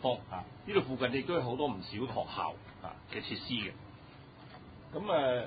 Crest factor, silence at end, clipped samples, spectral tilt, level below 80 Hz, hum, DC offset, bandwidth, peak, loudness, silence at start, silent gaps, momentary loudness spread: 22 dB; 0 s; under 0.1%; -3.5 dB/octave; -62 dBFS; none; under 0.1%; 4.9 kHz; -14 dBFS; -36 LUFS; 0 s; none; 20 LU